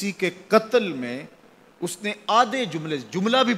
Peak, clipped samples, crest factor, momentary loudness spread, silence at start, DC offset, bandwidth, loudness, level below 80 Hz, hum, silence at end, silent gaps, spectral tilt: -2 dBFS; under 0.1%; 22 dB; 12 LU; 0 s; under 0.1%; 15.5 kHz; -24 LUFS; -72 dBFS; none; 0 s; none; -4.5 dB/octave